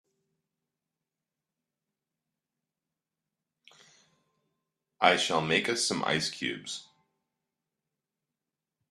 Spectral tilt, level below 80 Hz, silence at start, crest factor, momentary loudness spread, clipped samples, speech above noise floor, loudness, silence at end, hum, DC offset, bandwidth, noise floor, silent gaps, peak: -2.5 dB/octave; -74 dBFS; 5 s; 30 dB; 14 LU; under 0.1%; 60 dB; -28 LUFS; 2.1 s; none; under 0.1%; 13 kHz; -89 dBFS; none; -6 dBFS